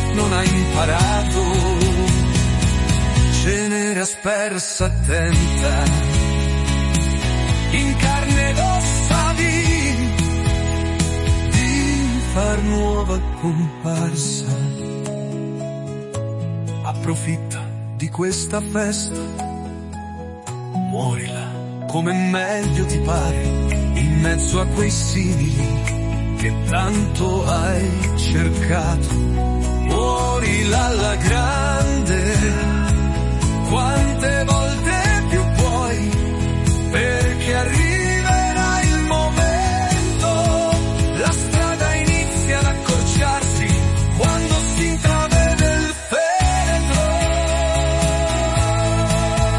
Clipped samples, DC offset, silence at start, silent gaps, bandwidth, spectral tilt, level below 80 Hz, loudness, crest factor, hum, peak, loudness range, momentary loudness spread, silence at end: under 0.1%; under 0.1%; 0 s; none; 11.5 kHz; -5 dB/octave; -24 dBFS; -19 LUFS; 14 dB; none; -4 dBFS; 6 LU; 7 LU; 0 s